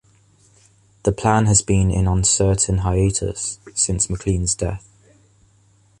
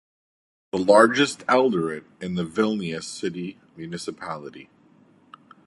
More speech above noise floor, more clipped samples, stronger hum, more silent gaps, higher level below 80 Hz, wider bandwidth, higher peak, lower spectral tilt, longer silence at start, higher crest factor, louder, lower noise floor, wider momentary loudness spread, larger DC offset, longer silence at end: first, 38 dB vs 34 dB; neither; neither; neither; first, -32 dBFS vs -64 dBFS; about the same, 11 kHz vs 11.5 kHz; about the same, -2 dBFS vs -2 dBFS; about the same, -4.5 dB/octave vs -5 dB/octave; first, 1.05 s vs 0.75 s; about the same, 20 dB vs 24 dB; first, -19 LUFS vs -22 LUFS; about the same, -56 dBFS vs -56 dBFS; second, 9 LU vs 20 LU; neither; first, 1.2 s vs 1.05 s